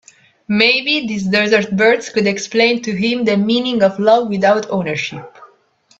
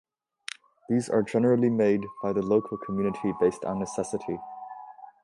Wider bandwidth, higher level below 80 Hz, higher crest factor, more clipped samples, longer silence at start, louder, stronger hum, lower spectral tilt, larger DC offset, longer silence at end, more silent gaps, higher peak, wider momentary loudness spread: second, 8 kHz vs 11.5 kHz; about the same, -58 dBFS vs -62 dBFS; about the same, 16 dB vs 16 dB; neither; second, 0.5 s vs 0.9 s; first, -15 LUFS vs -27 LUFS; neither; second, -4.5 dB/octave vs -7 dB/octave; neither; first, 0.55 s vs 0.15 s; neither; first, 0 dBFS vs -10 dBFS; second, 8 LU vs 19 LU